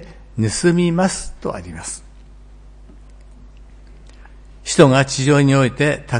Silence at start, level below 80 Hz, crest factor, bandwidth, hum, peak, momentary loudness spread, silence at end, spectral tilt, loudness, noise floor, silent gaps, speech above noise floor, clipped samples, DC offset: 0 s; -40 dBFS; 18 dB; 10.5 kHz; 50 Hz at -40 dBFS; 0 dBFS; 17 LU; 0 s; -5.5 dB/octave; -16 LUFS; -41 dBFS; none; 25 dB; under 0.1%; under 0.1%